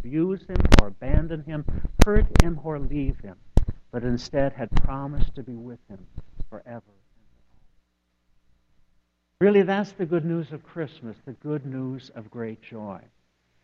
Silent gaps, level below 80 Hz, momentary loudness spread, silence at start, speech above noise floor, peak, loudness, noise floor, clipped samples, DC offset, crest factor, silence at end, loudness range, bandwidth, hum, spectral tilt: none; -28 dBFS; 22 LU; 0 s; 48 dB; 0 dBFS; -26 LUFS; -70 dBFS; under 0.1%; under 0.1%; 24 dB; 0.65 s; 15 LU; 11 kHz; none; -6.5 dB/octave